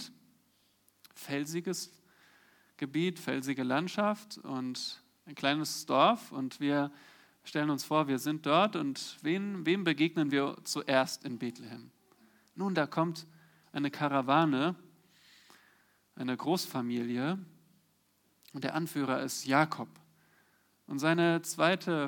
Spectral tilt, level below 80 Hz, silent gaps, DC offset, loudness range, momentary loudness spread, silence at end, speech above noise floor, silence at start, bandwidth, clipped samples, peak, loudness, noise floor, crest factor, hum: -5 dB/octave; -86 dBFS; none; under 0.1%; 6 LU; 13 LU; 0 s; 40 dB; 0 s; 19 kHz; under 0.1%; -12 dBFS; -32 LUFS; -72 dBFS; 22 dB; none